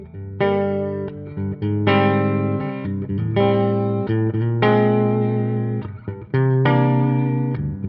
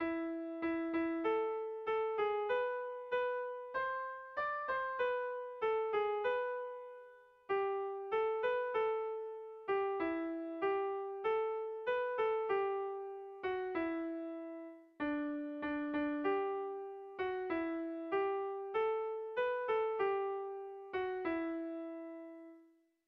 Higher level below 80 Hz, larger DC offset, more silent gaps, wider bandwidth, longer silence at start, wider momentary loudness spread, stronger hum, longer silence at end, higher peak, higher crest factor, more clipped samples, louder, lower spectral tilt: first, -48 dBFS vs -74 dBFS; neither; neither; about the same, 5.4 kHz vs 5.4 kHz; about the same, 0 s vs 0 s; about the same, 11 LU vs 10 LU; neither; second, 0 s vs 0.45 s; first, -4 dBFS vs -24 dBFS; about the same, 16 dB vs 14 dB; neither; first, -20 LUFS vs -38 LUFS; first, -7 dB/octave vs -2 dB/octave